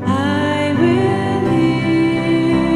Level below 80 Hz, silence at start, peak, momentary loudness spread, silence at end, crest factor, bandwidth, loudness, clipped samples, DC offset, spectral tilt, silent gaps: -42 dBFS; 0 s; -4 dBFS; 3 LU; 0 s; 12 dB; 11 kHz; -16 LUFS; under 0.1%; under 0.1%; -7 dB/octave; none